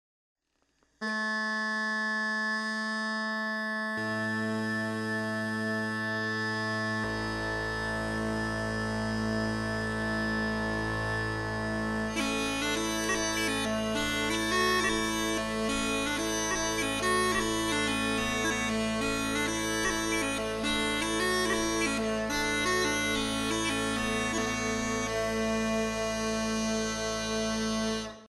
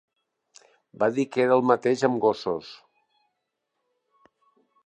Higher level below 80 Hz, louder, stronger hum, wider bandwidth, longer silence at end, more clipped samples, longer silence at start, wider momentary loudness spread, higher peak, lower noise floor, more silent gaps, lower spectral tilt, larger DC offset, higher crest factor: first, -48 dBFS vs -72 dBFS; second, -30 LUFS vs -24 LUFS; neither; first, 12 kHz vs 9 kHz; second, 0 s vs 2.1 s; neither; about the same, 1 s vs 1 s; second, 4 LU vs 11 LU; second, -14 dBFS vs -6 dBFS; second, -73 dBFS vs -80 dBFS; neither; second, -3.5 dB/octave vs -6 dB/octave; neither; second, 16 dB vs 22 dB